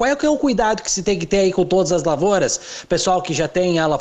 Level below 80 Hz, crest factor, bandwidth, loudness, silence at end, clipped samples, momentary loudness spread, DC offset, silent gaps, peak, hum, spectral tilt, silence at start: -42 dBFS; 14 dB; 9.4 kHz; -18 LUFS; 0 s; under 0.1%; 3 LU; under 0.1%; none; -4 dBFS; none; -4 dB/octave; 0 s